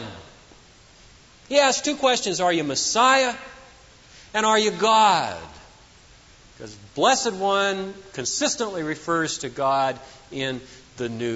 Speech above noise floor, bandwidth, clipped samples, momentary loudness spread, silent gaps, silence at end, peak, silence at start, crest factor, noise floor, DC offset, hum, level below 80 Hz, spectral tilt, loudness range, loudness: 29 dB; 8 kHz; under 0.1%; 19 LU; none; 0 s; -4 dBFS; 0 s; 20 dB; -51 dBFS; under 0.1%; none; -58 dBFS; -2.5 dB/octave; 5 LU; -22 LUFS